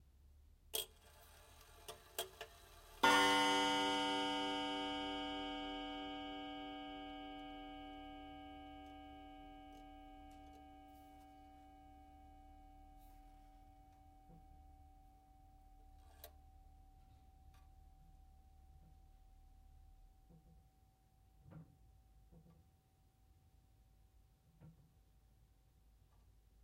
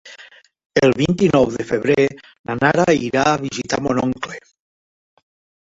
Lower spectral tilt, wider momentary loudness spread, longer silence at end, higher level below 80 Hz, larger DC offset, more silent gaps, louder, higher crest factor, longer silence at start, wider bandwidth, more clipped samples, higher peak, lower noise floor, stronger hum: second, -2.5 dB/octave vs -5.5 dB/octave; first, 28 LU vs 13 LU; first, 1.9 s vs 1.3 s; second, -66 dBFS vs -48 dBFS; neither; second, none vs 0.66-0.70 s, 2.39-2.44 s; second, -40 LUFS vs -18 LUFS; first, 28 dB vs 18 dB; first, 0.25 s vs 0.05 s; first, 16 kHz vs 8 kHz; neither; second, -18 dBFS vs -2 dBFS; first, -73 dBFS vs -46 dBFS; neither